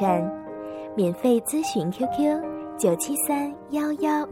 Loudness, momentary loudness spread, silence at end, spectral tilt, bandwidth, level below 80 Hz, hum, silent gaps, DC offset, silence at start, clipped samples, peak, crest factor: -25 LUFS; 9 LU; 0 s; -5 dB/octave; 17 kHz; -62 dBFS; none; none; under 0.1%; 0 s; under 0.1%; -10 dBFS; 16 dB